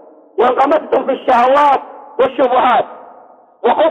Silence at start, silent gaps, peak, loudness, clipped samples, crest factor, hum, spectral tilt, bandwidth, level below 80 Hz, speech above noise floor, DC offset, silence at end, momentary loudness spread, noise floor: 0.35 s; none; -2 dBFS; -13 LUFS; under 0.1%; 12 dB; none; -5 dB/octave; 8.6 kHz; -56 dBFS; 30 dB; under 0.1%; 0 s; 8 LU; -42 dBFS